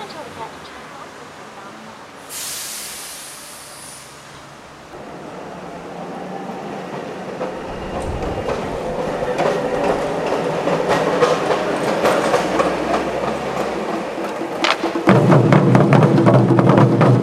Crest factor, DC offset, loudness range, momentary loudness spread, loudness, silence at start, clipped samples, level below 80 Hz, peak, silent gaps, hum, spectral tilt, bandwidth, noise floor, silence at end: 18 dB; under 0.1%; 17 LU; 23 LU; -18 LUFS; 0 s; under 0.1%; -44 dBFS; 0 dBFS; none; none; -6 dB/octave; 15 kHz; -39 dBFS; 0 s